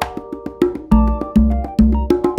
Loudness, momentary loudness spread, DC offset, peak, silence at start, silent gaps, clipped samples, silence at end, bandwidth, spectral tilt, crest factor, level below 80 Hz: -17 LUFS; 10 LU; under 0.1%; 0 dBFS; 0 s; none; under 0.1%; 0 s; 10.5 kHz; -8.5 dB/octave; 16 dB; -20 dBFS